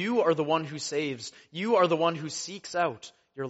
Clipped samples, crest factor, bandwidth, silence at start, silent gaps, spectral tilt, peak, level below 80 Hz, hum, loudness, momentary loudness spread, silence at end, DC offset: under 0.1%; 18 dB; 8 kHz; 0 s; none; -3.5 dB/octave; -10 dBFS; -74 dBFS; none; -28 LUFS; 15 LU; 0 s; under 0.1%